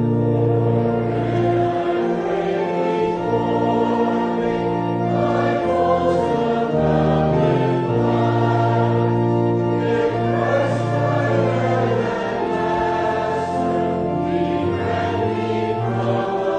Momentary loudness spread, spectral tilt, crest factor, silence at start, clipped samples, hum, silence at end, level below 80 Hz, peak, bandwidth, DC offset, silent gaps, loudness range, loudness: 4 LU; -8.5 dB/octave; 14 dB; 0 s; under 0.1%; none; 0 s; -44 dBFS; -4 dBFS; 9 kHz; under 0.1%; none; 3 LU; -19 LUFS